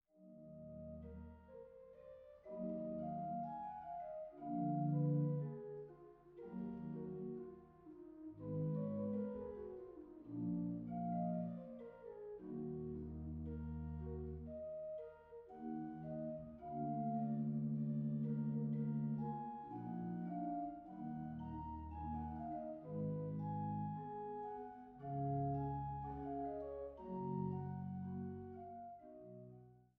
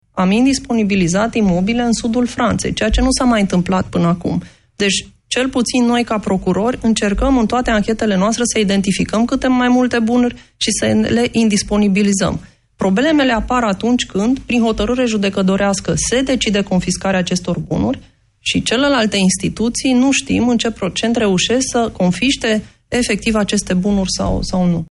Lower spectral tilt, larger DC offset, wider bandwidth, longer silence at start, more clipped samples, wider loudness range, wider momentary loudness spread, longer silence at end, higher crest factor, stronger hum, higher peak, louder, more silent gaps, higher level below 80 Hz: first, -11.5 dB/octave vs -4.5 dB/octave; neither; second, 3.4 kHz vs 11.5 kHz; about the same, 0.15 s vs 0.15 s; neither; first, 6 LU vs 2 LU; first, 16 LU vs 5 LU; about the same, 0.15 s vs 0.05 s; about the same, 16 dB vs 12 dB; neither; second, -28 dBFS vs -4 dBFS; second, -45 LUFS vs -16 LUFS; neither; second, -62 dBFS vs -32 dBFS